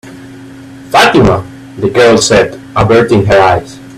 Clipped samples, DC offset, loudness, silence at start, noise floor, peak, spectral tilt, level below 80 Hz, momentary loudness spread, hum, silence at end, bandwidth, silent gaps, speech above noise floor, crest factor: 0.2%; under 0.1%; -8 LUFS; 0.05 s; -30 dBFS; 0 dBFS; -5 dB/octave; -32 dBFS; 9 LU; none; 0 s; 15 kHz; none; 22 dB; 10 dB